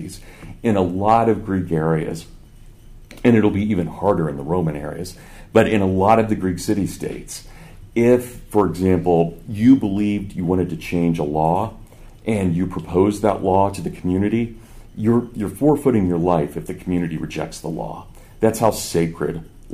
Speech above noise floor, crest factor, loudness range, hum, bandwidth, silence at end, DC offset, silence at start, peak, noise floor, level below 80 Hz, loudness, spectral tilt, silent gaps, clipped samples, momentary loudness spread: 24 dB; 18 dB; 3 LU; none; 15.5 kHz; 0 s; under 0.1%; 0 s; -2 dBFS; -42 dBFS; -42 dBFS; -20 LUFS; -7 dB/octave; none; under 0.1%; 13 LU